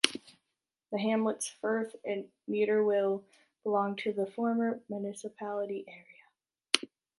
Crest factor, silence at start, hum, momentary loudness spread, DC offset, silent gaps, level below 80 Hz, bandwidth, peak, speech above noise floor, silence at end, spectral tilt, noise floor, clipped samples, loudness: 32 dB; 0.05 s; none; 11 LU; under 0.1%; none; -84 dBFS; 11.5 kHz; -2 dBFS; 55 dB; 0.35 s; -3.5 dB/octave; -87 dBFS; under 0.1%; -33 LUFS